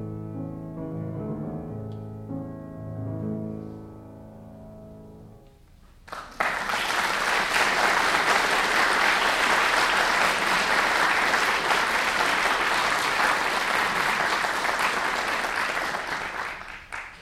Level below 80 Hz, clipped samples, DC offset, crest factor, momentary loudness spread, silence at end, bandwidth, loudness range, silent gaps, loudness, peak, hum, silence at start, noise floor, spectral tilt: -52 dBFS; under 0.1%; under 0.1%; 18 dB; 16 LU; 0 s; 17 kHz; 16 LU; none; -23 LUFS; -8 dBFS; none; 0 s; -52 dBFS; -2.5 dB/octave